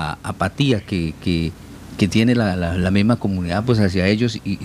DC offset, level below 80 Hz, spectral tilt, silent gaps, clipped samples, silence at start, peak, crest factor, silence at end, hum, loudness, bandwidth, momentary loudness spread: under 0.1%; -40 dBFS; -6.5 dB/octave; none; under 0.1%; 0 s; -2 dBFS; 16 dB; 0 s; none; -19 LUFS; 14 kHz; 7 LU